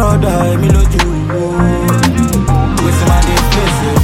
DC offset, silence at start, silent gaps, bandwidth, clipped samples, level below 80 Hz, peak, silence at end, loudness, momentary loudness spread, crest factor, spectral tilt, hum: under 0.1%; 0 s; none; 17 kHz; under 0.1%; -16 dBFS; 0 dBFS; 0 s; -12 LUFS; 3 LU; 10 dB; -5.5 dB/octave; none